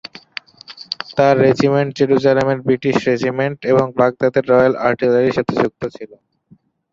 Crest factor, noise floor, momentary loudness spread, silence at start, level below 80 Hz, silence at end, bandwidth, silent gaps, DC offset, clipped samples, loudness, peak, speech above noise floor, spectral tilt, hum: 16 dB; -52 dBFS; 15 LU; 0.7 s; -54 dBFS; 0.85 s; 7.6 kHz; none; under 0.1%; under 0.1%; -16 LUFS; -2 dBFS; 37 dB; -7 dB/octave; none